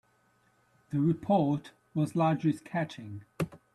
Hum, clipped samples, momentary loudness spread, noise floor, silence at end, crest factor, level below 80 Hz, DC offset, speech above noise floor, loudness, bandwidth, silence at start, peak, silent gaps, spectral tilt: none; under 0.1%; 11 LU; -69 dBFS; 0.2 s; 18 dB; -66 dBFS; under 0.1%; 39 dB; -31 LUFS; 12.5 kHz; 0.9 s; -14 dBFS; none; -8 dB/octave